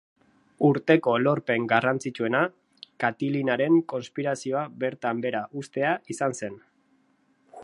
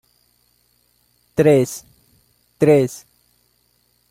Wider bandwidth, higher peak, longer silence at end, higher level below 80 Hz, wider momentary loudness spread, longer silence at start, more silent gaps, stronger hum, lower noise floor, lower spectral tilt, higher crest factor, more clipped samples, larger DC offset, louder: second, 11.5 kHz vs 16 kHz; about the same, -4 dBFS vs -2 dBFS; second, 0 s vs 1.15 s; second, -74 dBFS vs -58 dBFS; second, 9 LU vs 16 LU; second, 0.6 s vs 1.4 s; neither; second, none vs 60 Hz at -55 dBFS; about the same, -66 dBFS vs -63 dBFS; about the same, -6 dB/octave vs -6.5 dB/octave; about the same, 22 dB vs 20 dB; neither; neither; second, -26 LUFS vs -17 LUFS